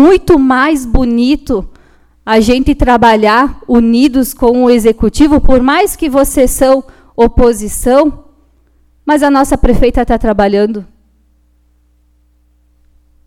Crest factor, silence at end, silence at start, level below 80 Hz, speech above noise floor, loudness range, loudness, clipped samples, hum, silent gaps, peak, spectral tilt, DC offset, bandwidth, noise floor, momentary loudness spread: 10 dB; 2.4 s; 0 s; -22 dBFS; 43 dB; 4 LU; -10 LUFS; 1%; 60 Hz at -50 dBFS; none; 0 dBFS; -5 dB/octave; under 0.1%; 16.5 kHz; -51 dBFS; 6 LU